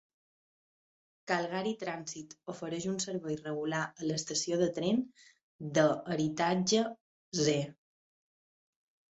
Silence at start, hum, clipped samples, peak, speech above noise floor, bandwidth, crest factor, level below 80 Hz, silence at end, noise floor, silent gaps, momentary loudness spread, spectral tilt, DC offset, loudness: 1.25 s; none; under 0.1%; -14 dBFS; over 57 dB; 8.4 kHz; 20 dB; -72 dBFS; 1.35 s; under -90 dBFS; 5.43-5.59 s, 7.00-7.32 s; 14 LU; -4.5 dB/octave; under 0.1%; -33 LUFS